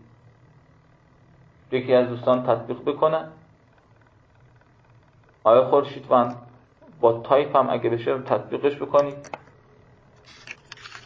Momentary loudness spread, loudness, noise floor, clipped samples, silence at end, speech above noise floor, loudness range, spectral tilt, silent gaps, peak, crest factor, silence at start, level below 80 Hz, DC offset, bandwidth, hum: 22 LU; -22 LUFS; -56 dBFS; under 0.1%; 0.05 s; 35 dB; 5 LU; -7.5 dB/octave; none; -4 dBFS; 20 dB; 1.7 s; -64 dBFS; under 0.1%; 7.4 kHz; none